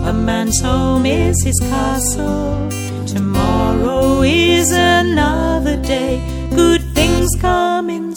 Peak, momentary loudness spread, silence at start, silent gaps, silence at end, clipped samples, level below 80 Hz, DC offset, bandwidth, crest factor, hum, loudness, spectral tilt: 0 dBFS; 8 LU; 0 s; none; 0 s; under 0.1%; -24 dBFS; under 0.1%; 17.5 kHz; 14 dB; none; -15 LUFS; -4.5 dB/octave